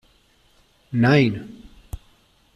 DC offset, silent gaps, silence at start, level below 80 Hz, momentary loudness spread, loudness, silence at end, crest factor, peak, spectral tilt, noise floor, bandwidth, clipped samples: under 0.1%; none; 0.9 s; -48 dBFS; 24 LU; -19 LUFS; 0.6 s; 20 dB; -4 dBFS; -7.5 dB/octave; -59 dBFS; 13.5 kHz; under 0.1%